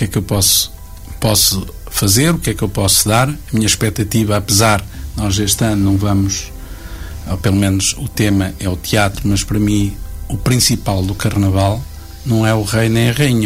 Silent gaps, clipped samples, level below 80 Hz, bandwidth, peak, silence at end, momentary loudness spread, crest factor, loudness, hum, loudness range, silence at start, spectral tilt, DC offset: none; under 0.1%; -30 dBFS; 16 kHz; -2 dBFS; 0 s; 13 LU; 14 dB; -14 LUFS; none; 3 LU; 0 s; -4 dB/octave; under 0.1%